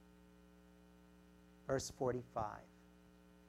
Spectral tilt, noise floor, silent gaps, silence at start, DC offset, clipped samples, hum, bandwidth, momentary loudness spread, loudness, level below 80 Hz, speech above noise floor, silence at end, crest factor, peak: -5 dB/octave; -65 dBFS; none; 0 s; under 0.1%; under 0.1%; 60 Hz at -65 dBFS; 16.5 kHz; 24 LU; -43 LUFS; -68 dBFS; 23 dB; 0.05 s; 22 dB; -24 dBFS